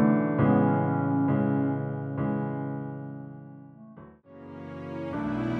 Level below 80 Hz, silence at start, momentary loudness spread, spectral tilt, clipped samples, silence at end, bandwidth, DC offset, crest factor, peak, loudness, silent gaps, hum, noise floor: -58 dBFS; 0 s; 24 LU; -11 dB/octave; under 0.1%; 0 s; 4.4 kHz; under 0.1%; 18 dB; -10 dBFS; -27 LUFS; none; none; -49 dBFS